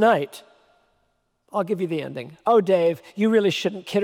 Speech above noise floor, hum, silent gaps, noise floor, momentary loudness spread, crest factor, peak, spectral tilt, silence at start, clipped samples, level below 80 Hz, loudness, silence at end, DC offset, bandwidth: 49 dB; none; none; -70 dBFS; 11 LU; 16 dB; -6 dBFS; -6 dB/octave; 0 s; under 0.1%; -74 dBFS; -22 LUFS; 0 s; under 0.1%; 16 kHz